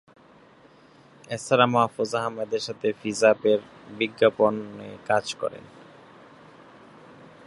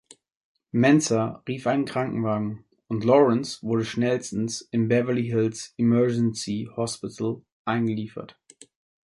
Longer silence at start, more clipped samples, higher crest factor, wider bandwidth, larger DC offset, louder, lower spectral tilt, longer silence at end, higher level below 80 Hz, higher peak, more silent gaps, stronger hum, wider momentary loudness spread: first, 1.3 s vs 0.75 s; neither; first, 24 dB vs 18 dB; about the same, 11.5 kHz vs 11.5 kHz; neither; about the same, -24 LUFS vs -25 LUFS; second, -4.5 dB/octave vs -6 dB/octave; first, 1.85 s vs 0.75 s; second, -70 dBFS vs -62 dBFS; about the same, -4 dBFS vs -6 dBFS; second, none vs 7.52-7.65 s; neither; first, 15 LU vs 11 LU